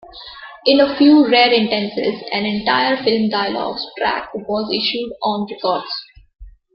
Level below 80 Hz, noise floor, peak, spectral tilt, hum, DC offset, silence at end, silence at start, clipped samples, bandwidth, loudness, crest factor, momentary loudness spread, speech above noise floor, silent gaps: -50 dBFS; -36 dBFS; 0 dBFS; -8 dB/octave; none; under 0.1%; 0.25 s; 0.05 s; under 0.1%; 5.8 kHz; -17 LUFS; 16 dB; 13 LU; 20 dB; none